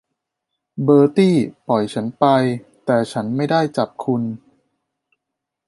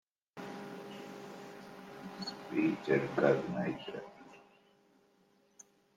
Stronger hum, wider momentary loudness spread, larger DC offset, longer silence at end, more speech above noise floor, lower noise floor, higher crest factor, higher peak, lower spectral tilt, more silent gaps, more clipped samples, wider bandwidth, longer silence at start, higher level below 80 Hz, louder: neither; second, 11 LU vs 20 LU; neither; first, 1.3 s vs 0.35 s; first, 64 dB vs 37 dB; first, -81 dBFS vs -70 dBFS; second, 18 dB vs 24 dB; first, -2 dBFS vs -14 dBFS; about the same, -7.5 dB/octave vs -6.5 dB/octave; neither; neither; second, 11.5 kHz vs 15.5 kHz; first, 0.75 s vs 0.35 s; first, -64 dBFS vs -76 dBFS; first, -18 LUFS vs -36 LUFS